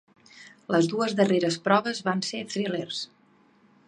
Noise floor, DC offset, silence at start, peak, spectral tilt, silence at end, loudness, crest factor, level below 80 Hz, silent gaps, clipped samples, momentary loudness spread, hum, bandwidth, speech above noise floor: -61 dBFS; under 0.1%; 0.35 s; -6 dBFS; -5 dB/octave; 0.85 s; -26 LUFS; 22 dB; -76 dBFS; none; under 0.1%; 11 LU; none; 10.5 kHz; 35 dB